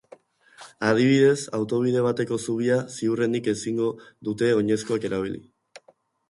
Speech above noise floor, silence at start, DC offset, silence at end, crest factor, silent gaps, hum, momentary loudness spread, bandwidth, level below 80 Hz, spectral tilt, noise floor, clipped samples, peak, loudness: 38 dB; 0.6 s; under 0.1%; 0.9 s; 18 dB; none; none; 10 LU; 11.5 kHz; -62 dBFS; -6 dB/octave; -61 dBFS; under 0.1%; -6 dBFS; -24 LUFS